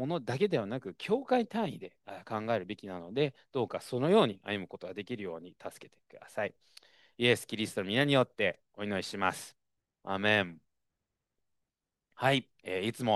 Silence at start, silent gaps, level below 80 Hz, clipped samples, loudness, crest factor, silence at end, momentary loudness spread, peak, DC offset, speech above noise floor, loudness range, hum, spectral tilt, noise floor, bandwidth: 0 s; none; -76 dBFS; under 0.1%; -32 LUFS; 22 dB; 0 s; 15 LU; -12 dBFS; under 0.1%; 56 dB; 4 LU; none; -5 dB/octave; -88 dBFS; 12.5 kHz